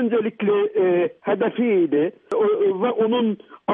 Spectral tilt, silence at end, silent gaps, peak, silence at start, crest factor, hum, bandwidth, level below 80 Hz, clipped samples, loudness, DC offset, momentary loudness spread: -8.5 dB/octave; 0 s; none; -8 dBFS; 0 s; 12 dB; none; 3.8 kHz; -76 dBFS; under 0.1%; -21 LUFS; under 0.1%; 4 LU